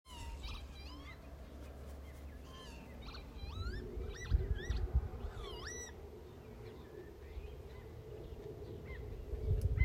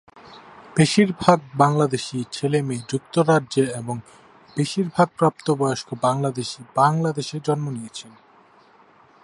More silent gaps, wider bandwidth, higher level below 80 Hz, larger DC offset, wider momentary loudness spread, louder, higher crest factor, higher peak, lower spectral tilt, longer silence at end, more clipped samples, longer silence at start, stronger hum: neither; first, 15.5 kHz vs 11.5 kHz; first, -44 dBFS vs -60 dBFS; neither; about the same, 14 LU vs 12 LU; second, -46 LUFS vs -21 LUFS; about the same, 24 dB vs 22 dB; second, -20 dBFS vs 0 dBFS; about the same, -5.5 dB/octave vs -6 dB/octave; second, 0 s vs 1.15 s; neither; about the same, 0.05 s vs 0.15 s; neither